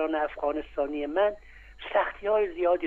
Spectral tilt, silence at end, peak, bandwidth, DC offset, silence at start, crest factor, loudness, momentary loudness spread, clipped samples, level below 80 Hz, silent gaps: -6.5 dB/octave; 0 s; -12 dBFS; 4.5 kHz; under 0.1%; 0 s; 16 dB; -28 LUFS; 5 LU; under 0.1%; -52 dBFS; none